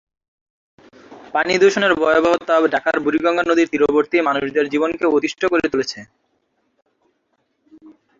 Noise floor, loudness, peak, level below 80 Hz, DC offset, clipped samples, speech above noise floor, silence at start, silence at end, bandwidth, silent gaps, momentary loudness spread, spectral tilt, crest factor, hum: -68 dBFS; -17 LUFS; -2 dBFS; -56 dBFS; under 0.1%; under 0.1%; 51 dB; 1.1 s; 0.3 s; 7.6 kHz; none; 7 LU; -4.5 dB/octave; 16 dB; none